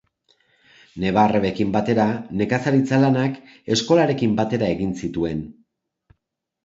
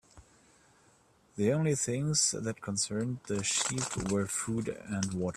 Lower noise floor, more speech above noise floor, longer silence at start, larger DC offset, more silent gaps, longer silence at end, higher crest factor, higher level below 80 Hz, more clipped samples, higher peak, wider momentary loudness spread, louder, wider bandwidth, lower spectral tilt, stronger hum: first, -77 dBFS vs -65 dBFS; first, 58 dB vs 33 dB; first, 0.95 s vs 0.15 s; neither; neither; first, 1.15 s vs 0.05 s; about the same, 18 dB vs 18 dB; first, -50 dBFS vs -60 dBFS; neither; first, -2 dBFS vs -14 dBFS; about the same, 9 LU vs 8 LU; first, -20 LUFS vs -31 LUFS; second, 8 kHz vs 15 kHz; first, -6.5 dB/octave vs -4 dB/octave; neither